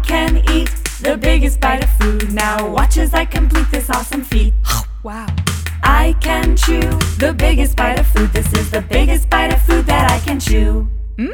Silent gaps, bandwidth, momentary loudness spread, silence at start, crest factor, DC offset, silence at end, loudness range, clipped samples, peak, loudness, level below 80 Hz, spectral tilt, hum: none; 18.5 kHz; 6 LU; 0 s; 12 dB; under 0.1%; 0 s; 2 LU; under 0.1%; 0 dBFS; -15 LUFS; -16 dBFS; -5 dB/octave; none